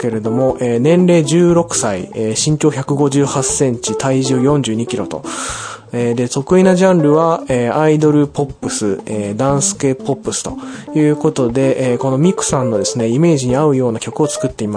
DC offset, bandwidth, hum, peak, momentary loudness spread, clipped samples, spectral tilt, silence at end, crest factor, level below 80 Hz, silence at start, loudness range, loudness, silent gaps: under 0.1%; 10.5 kHz; none; 0 dBFS; 9 LU; under 0.1%; -5.5 dB/octave; 0 s; 14 dB; -44 dBFS; 0 s; 3 LU; -14 LUFS; none